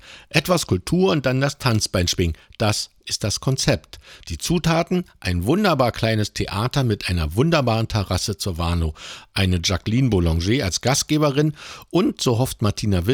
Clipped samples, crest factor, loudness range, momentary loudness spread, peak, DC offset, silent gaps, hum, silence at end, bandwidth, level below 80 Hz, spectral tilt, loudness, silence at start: under 0.1%; 18 dB; 2 LU; 6 LU; -2 dBFS; under 0.1%; none; none; 0 s; over 20 kHz; -36 dBFS; -5 dB/octave; -21 LUFS; 0.05 s